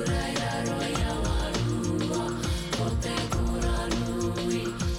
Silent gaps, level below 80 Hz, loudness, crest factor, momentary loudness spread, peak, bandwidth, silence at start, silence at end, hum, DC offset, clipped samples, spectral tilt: none; -34 dBFS; -29 LUFS; 14 dB; 1 LU; -14 dBFS; 16 kHz; 0 s; 0 s; none; under 0.1%; under 0.1%; -5 dB/octave